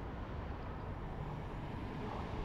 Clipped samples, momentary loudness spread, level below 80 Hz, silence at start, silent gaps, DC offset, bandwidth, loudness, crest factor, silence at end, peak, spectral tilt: under 0.1%; 2 LU; -48 dBFS; 0 s; none; under 0.1%; 11.5 kHz; -45 LUFS; 12 dB; 0 s; -30 dBFS; -8 dB/octave